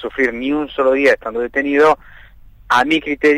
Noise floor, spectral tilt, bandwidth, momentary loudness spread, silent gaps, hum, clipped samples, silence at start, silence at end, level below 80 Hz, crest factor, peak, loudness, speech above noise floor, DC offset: -42 dBFS; -4.5 dB/octave; 14 kHz; 7 LU; none; none; under 0.1%; 0 s; 0 s; -44 dBFS; 12 dB; -4 dBFS; -16 LUFS; 26 dB; under 0.1%